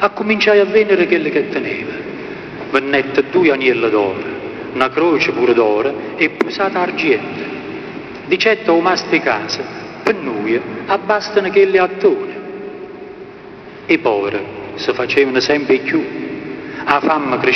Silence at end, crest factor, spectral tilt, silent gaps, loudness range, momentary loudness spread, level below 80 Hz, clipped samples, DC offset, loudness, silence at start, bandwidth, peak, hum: 0 s; 16 dB; -5 dB/octave; none; 2 LU; 15 LU; -54 dBFS; under 0.1%; under 0.1%; -15 LUFS; 0 s; 6.6 kHz; 0 dBFS; none